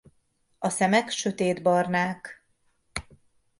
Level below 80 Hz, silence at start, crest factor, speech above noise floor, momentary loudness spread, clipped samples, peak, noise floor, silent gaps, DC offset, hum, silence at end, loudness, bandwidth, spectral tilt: -58 dBFS; 0.6 s; 18 dB; 44 dB; 15 LU; under 0.1%; -8 dBFS; -69 dBFS; none; under 0.1%; none; 0.6 s; -25 LUFS; 11.5 kHz; -4.5 dB/octave